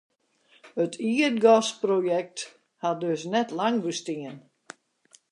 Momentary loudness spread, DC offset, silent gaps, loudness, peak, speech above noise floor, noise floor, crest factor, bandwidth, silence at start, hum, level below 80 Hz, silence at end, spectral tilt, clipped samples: 17 LU; under 0.1%; none; -25 LUFS; -6 dBFS; 38 dB; -63 dBFS; 20 dB; 11 kHz; 0.65 s; none; -82 dBFS; 0.9 s; -4.5 dB/octave; under 0.1%